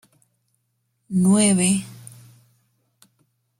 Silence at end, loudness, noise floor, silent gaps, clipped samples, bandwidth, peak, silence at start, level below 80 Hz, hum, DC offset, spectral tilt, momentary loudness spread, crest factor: 1.65 s; -19 LUFS; -72 dBFS; none; under 0.1%; 14.5 kHz; -4 dBFS; 1.1 s; -62 dBFS; none; under 0.1%; -4.5 dB/octave; 22 LU; 20 dB